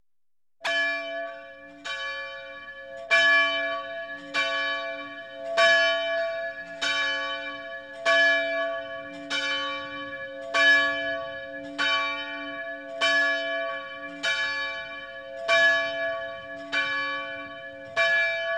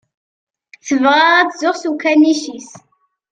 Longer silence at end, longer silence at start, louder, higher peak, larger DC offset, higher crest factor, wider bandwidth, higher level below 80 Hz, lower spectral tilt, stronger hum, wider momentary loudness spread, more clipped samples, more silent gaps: second, 0 s vs 0.55 s; second, 0.6 s vs 0.85 s; second, -25 LUFS vs -13 LUFS; second, -8 dBFS vs 0 dBFS; neither; about the same, 18 dB vs 16 dB; first, 12 kHz vs 9.2 kHz; about the same, -66 dBFS vs -66 dBFS; about the same, -1 dB/octave vs -2 dB/octave; neither; about the same, 17 LU vs 18 LU; neither; neither